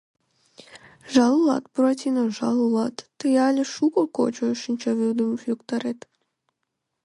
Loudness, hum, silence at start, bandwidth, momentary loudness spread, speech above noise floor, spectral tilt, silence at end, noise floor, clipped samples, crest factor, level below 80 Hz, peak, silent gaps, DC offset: -23 LUFS; none; 0.75 s; 11 kHz; 9 LU; 58 dB; -5 dB/octave; 1.1 s; -80 dBFS; under 0.1%; 18 dB; -70 dBFS; -6 dBFS; none; under 0.1%